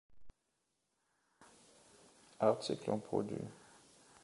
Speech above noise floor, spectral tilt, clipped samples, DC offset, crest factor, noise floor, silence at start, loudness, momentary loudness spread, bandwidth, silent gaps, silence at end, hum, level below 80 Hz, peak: 47 dB; -6 dB/octave; under 0.1%; under 0.1%; 24 dB; -84 dBFS; 0.1 s; -38 LUFS; 15 LU; 11.5 kHz; none; 0.6 s; none; -74 dBFS; -18 dBFS